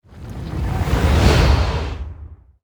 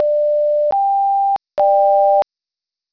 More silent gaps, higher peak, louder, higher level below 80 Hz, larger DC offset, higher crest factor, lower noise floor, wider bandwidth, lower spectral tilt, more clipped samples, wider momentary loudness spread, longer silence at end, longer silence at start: neither; first, 0 dBFS vs -6 dBFS; second, -18 LUFS vs -15 LUFS; first, -22 dBFS vs -64 dBFS; second, under 0.1% vs 0.2%; first, 18 dB vs 10 dB; second, -39 dBFS vs -87 dBFS; first, 20 kHz vs 5.4 kHz; about the same, -6 dB/octave vs -6 dB/octave; neither; first, 20 LU vs 5 LU; second, 0.3 s vs 0.7 s; first, 0.15 s vs 0 s